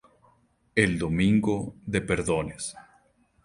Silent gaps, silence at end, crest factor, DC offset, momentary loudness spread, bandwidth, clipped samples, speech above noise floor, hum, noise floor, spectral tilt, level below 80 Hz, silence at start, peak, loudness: none; 0.65 s; 22 dB; under 0.1%; 11 LU; 11.5 kHz; under 0.1%; 39 dB; none; -64 dBFS; -5.5 dB/octave; -48 dBFS; 0.75 s; -4 dBFS; -26 LUFS